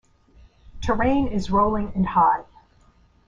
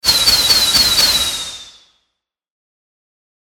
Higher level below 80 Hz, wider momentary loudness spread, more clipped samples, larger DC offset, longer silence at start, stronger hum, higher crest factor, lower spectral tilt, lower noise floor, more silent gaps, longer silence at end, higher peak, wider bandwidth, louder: about the same, -38 dBFS vs -40 dBFS; second, 8 LU vs 12 LU; neither; neither; first, 0.75 s vs 0.05 s; neither; about the same, 16 dB vs 18 dB; first, -7.5 dB/octave vs 0.5 dB/octave; second, -57 dBFS vs -74 dBFS; neither; second, 0.85 s vs 1.75 s; second, -6 dBFS vs 0 dBFS; second, 7.6 kHz vs 18 kHz; second, -22 LUFS vs -10 LUFS